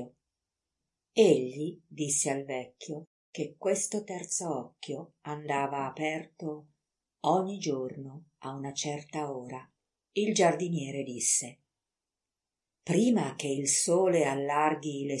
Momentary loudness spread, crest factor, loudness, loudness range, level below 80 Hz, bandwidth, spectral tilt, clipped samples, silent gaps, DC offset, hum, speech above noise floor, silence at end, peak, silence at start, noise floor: 17 LU; 22 dB; -30 LUFS; 6 LU; -82 dBFS; 11.5 kHz; -4 dB/octave; under 0.1%; 3.07-3.33 s; under 0.1%; none; over 60 dB; 0 s; -10 dBFS; 0 s; under -90 dBFS